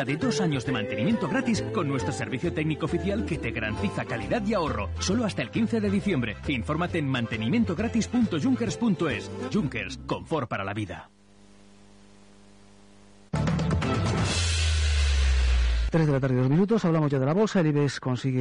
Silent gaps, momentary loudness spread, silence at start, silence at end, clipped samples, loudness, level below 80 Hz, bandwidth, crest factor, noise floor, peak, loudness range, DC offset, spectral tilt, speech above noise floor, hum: none; 6 LU; 0 s; 0 s; under 0.1%; -26 LUFS; -34 dBFS; 10.5 kHz; 12 dB; -55 dBFS; -14 dBFS; 9 LU; under 0.1%; -6 dB/octave; 29 dB; none